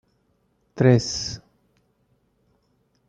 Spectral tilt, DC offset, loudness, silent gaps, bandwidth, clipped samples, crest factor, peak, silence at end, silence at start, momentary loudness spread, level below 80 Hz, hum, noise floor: -5.5 dB/octave; under 0.1%; -21 LUFS; none; 7.8 kHz; under 0.1%; 22 dB; -4 dBFS; 1.7 s; 0.75 s; 22 LU; -54 dBFS; none; -67 dBFS